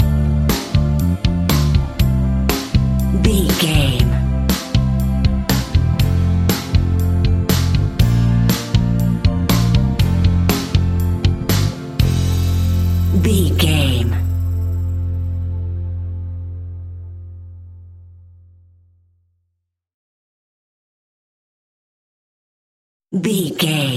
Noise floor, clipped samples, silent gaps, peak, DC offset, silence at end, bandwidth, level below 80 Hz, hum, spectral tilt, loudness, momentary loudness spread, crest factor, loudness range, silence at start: -74 dBFS; under 0.1%; 19.94-23.00 s; 0 dBFS; under 0.1%; 0 s; 16 kHz; -24 dBFS; none; -6 dB/octave; -17 LUFS; 10 LU; 16 dB; 12 LU; 0 s